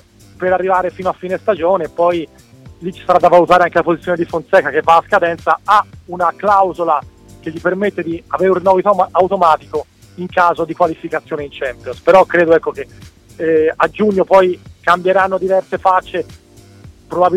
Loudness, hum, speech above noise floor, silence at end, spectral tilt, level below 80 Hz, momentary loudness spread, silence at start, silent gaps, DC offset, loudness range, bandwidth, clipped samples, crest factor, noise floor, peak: -14 LUFS; none; 26 dB; 0 s; -6.5 dB/octave; -46 dBFS; 13 LU; 0.4 s; none; under 0.1%; 3 LU; 13 kHz; under 0.1%; 14 dB; -40 dBFS; 0 dBFS